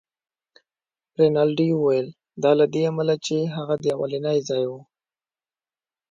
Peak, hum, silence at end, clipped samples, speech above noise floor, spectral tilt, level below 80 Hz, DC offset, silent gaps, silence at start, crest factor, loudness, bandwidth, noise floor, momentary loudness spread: -6 dBFS; none; 1.3 s; under 0.1%; over 69 dB; -6.5 dB/octave; -68 dBFS; under 0.1%; none; 1.2 s; 18 dB; -22 LUFS; 7.8 kHz; under -90 dBFS; 8 LU